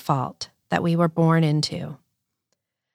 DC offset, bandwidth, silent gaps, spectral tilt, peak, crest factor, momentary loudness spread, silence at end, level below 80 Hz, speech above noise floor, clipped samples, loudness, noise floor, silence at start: under 0.1%; 13.5 kHz; none; -6.5 dB/octave; -4 dBFS; 18 dB; 15 LU; 1 s; -66 dBFS; 56 dB; under 0.1%; -22 LUFS; -78 dBFS; 0.05 s